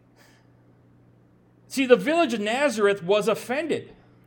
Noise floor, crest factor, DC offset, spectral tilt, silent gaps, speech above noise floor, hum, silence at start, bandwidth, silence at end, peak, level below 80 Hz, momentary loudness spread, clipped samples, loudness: -57 dBFS; 24 dB; under 0.1%; -4.5 dB/octave; none; 35 dB; none; 1.7 s; 18.5 kHz; 0.35 s; -2 dBFS; -70 dBFS; 10 LU; under 0.1%; -23 LUFS